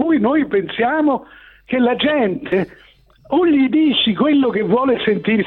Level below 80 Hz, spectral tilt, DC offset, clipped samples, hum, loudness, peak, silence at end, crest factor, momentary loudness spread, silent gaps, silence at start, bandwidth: -52 dBFS; -8.5 dB/octave; under 0.1%; under 0.1%; none; -16 LUFS; -4 dBFS; 0 s; 12 dB; 7 LU; none; 0 s; 4.3 kHz